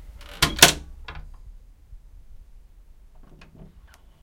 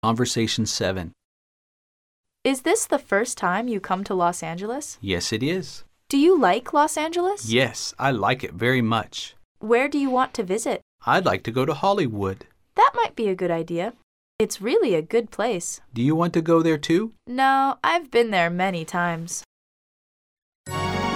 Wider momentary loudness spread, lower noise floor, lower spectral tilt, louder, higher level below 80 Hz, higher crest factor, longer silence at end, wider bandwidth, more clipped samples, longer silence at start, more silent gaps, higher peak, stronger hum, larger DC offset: first, 29 LU vs 10 LU; second, -50 dBFS vs under -90 dBFS; second, -1 dB/octave vs -4.5 dB/octave; first, -17 LUFS vs -23 LUFS; first, -42 dBFS vs -56 dBFS; first, 28 dB vs 18 dB; first, 2.25 s vs 0 s; about the same, 16.5 kHz vs 16.5 kHz; neither; about the same, 0.05 s vs 0.05 s; second, none vs 1.25-2.24 s, 9.45-9.55 s, 10.82-10.99 s, 14.03-14.39 s, 19.46-20.64 s; first, 0 dBFS vs -6 dBFS; neither; neither